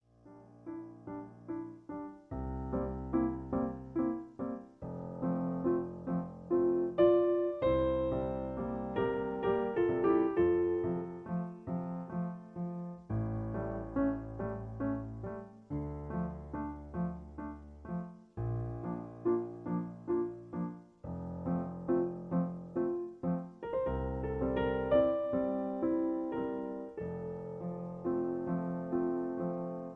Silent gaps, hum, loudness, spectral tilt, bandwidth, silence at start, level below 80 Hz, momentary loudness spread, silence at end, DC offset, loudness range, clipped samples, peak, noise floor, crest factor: none; none; -35 LUFS; -10.5 dB/octave; 4 kHz; 0.25 s; -52 dBFS; 14 LU; 0 s; under 0.1%; 8 LU; under 0.1%; -16 dBFS; -57 dBFS; 20 dB